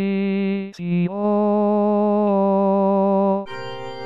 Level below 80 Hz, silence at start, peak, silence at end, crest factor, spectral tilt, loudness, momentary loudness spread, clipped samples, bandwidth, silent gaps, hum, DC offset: -66 dBFS; 0 s; -10 dBFS; 0 s; 10 dB; -9.5 dB/octave; -19 LUFS; 8 LU; under 0.1%; 5.8 kHz; none; none; under 0.1%